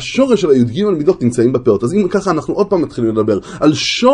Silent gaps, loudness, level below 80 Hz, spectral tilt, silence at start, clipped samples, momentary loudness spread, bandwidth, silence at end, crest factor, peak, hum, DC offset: none; -14 LUFS; -44 dBFS; -5.5 dB/octave; 0 s; under 0.1%; 4 LU; 11 kHz; 0 s; 14 dB; 0 dBFS; none; under 0.1%